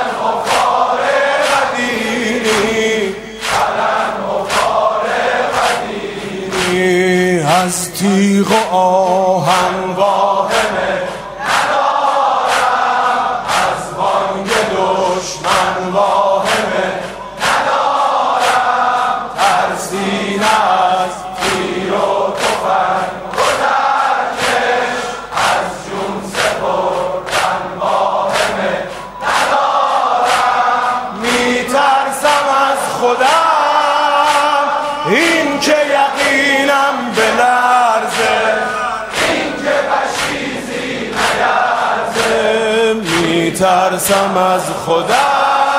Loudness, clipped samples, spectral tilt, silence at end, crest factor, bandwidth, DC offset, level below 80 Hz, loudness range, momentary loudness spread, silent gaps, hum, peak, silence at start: -14 LUFS; under 0.1%; -3.5 dB/octave; 0 s; 14 dB; 16 kHz; under 0.1%; -46 dBFS; 3 LU; 6 LU; none; none; 0 dBFS; 0 s